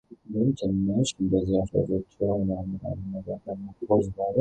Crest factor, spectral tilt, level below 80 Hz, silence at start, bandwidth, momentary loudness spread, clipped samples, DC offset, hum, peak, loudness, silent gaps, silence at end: 18 dB; -7.5 dB/octave; -48 dBFS; 0.1 s; 9.2 kHz; 10 LU; under 0.1%; under 0.1%; none; -8 dBFS; -27 LUFS; none; 0 s